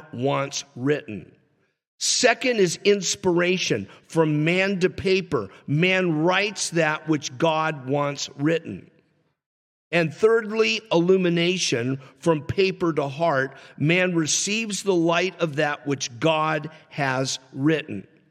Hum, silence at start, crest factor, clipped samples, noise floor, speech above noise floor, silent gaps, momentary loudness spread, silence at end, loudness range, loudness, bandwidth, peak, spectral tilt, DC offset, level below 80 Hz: none; 0 s; 18 dB; under 0.1%; -66 dBFS; 44 dB; 1.87-1.98 s, 9.46-9.91 s; 8 LU; 0.3 s; 3 LU; -23 LUFS; 14.5 kHz; -6 dBFS; -4 dB/octave; under 0.1%; -62 dBFS